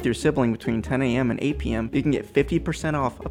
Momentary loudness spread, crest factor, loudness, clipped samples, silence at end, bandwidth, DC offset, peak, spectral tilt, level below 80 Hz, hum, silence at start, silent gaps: 4 LU; 18 dB; -24 LUFS; under 0.1%; 0 s; 15.5 kHz; under 0.1%; -6 dBFS; -6.5 dB/octave; -40 dBFS; none; 0 s; none